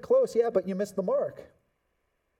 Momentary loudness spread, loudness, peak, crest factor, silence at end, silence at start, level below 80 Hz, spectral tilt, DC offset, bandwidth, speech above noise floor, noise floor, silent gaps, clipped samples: 8 LU; -28 LUFS; -12 dBFS; 16 dB; 0.95 s; 0.05 s; -72 dBFS; -6.5 dB/octave; under 0.1%; 14.5 kHz; 49 dB; -76 dBFS; none; under 0.1%